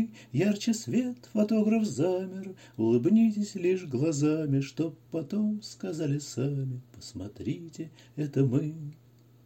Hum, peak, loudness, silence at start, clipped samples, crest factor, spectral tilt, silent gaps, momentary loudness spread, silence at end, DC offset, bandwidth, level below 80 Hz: none; -14 dBFS; -29 LUFS; 0 s; under 0.1%; 16 dB; -7 dB/octave; none; 16 LU; 0.5 s; under 0.1%; 16 kHz; -68 dBFS